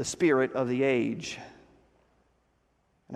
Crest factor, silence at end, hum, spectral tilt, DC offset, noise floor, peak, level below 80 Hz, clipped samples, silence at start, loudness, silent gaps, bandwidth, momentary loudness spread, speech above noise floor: 18 dB; 0 s; none; -5 dB/octave; under 0.1%; -71 dBFS; -12 dBFS; -66 dBFS; under 0.1%; 0 s; -27 LUFS; none; 13 kHz; 13 LU; 43 dB